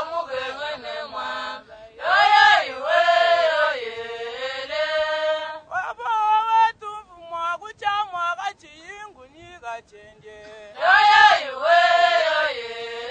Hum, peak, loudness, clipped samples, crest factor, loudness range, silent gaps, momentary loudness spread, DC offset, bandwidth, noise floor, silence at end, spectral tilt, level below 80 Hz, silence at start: none; -2 dBFS; -20 LUFS; under 0.1%; 20 dB; 11 LU; none; 21 LU; under 0.1%; 9 kHz; -47 dBFS; 0 s; -1 dB/octave; -62 dBFS; 0 s